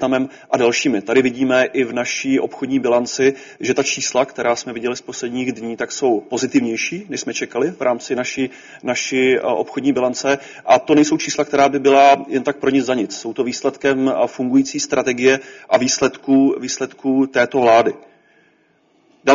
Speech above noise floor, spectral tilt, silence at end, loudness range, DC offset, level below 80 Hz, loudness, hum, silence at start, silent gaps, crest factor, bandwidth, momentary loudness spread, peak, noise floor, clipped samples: 41 dB; -3 dB/octave; 0 s; 5 LU; under 0.1%; -60 dBFS; -18 LUFS; none; 0 s; none; 18 dB; 7.6 kHz; 10 LU; 0 dBFS; -58 dBFS; under 0.1%